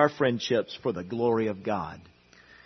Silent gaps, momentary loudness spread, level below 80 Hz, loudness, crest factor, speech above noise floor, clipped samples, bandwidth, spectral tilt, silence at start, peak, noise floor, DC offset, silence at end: none; 9 LU; -66 dBFS; -28 LUFS; 22 dB; 28 dB; under 0.1%; 6.4 kHz; -6 dB/octave; 0 s; -6 dBFS; -55 dBFS; under 0.1%; 0.65 s